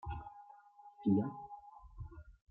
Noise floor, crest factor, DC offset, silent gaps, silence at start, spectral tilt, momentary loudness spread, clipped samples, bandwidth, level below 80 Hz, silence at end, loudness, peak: -60 dBFS; 22 dB; under 0.1%; none; 0.05 s; -11.5 dB/octave; 25 LU; under 0.1%; 4.1 kHz; -56 dBFS; 0.2 s; -38 LUFS; -20 dBFS